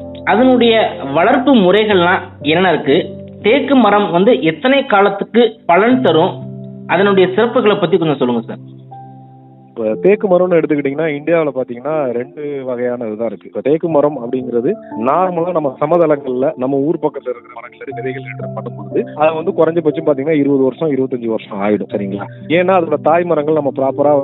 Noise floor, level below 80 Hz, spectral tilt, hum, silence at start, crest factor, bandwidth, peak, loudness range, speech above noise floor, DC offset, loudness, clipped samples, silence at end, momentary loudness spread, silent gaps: -40 dBFS; -62 dBFS; -9.5 dB/octave; none; 0 s; 14 dB; 4.1 kHz; 0 dBFS; 6 LU; 26 dB; under 0.1%; -14 LUFS; under 0.1%; 0 s; 12 LU; none